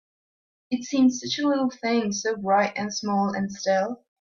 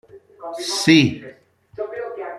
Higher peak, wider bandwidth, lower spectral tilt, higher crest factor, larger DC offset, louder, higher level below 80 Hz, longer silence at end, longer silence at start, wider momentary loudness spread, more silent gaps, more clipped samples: second, -10 dBFS vs -2 dBFS; second, 7.4 kHz vs 13.5 kHz; about the same, -4.5 dB/octave vs -4.5 dB/octave; about the same, 16 dB vs 20 dB; neither; second, -25 LUFS vs -18 LUFS; second, -68 dBFS vs -58 dBFS; first, 0.25 s vs 0 s; first, 0.7 s vs 0.15 s; second, 7 LU vs 21 LU; neither; neither